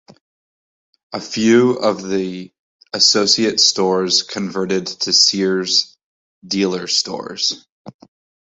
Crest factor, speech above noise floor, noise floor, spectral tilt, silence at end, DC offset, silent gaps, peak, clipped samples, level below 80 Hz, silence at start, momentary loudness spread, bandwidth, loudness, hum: 18 dB; over 73 dB; under -90 dBFS; -2.5 dB/octave; 0.55 s; under 0.1%; 2.59-2.79 s, 6.03-6.42 s, 7.69-7.85 s; 0 dBFS; under 0.1%; -62 dBFS; 1.1 s; 15 LU; 8 kHz; -16 LUFS; none